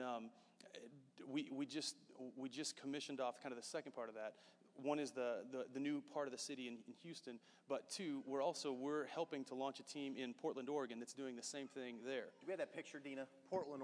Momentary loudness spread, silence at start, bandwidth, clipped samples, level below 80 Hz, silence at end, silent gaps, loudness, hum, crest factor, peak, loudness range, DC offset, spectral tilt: 12 LU; 0 s; 11 kHz; under 0.1%; under -90 dBFS; 0 s; none; -48 LUFS; none; 20 dB; -28 dBFS; 3 LU; under 0.1%; -3.5 dB/octave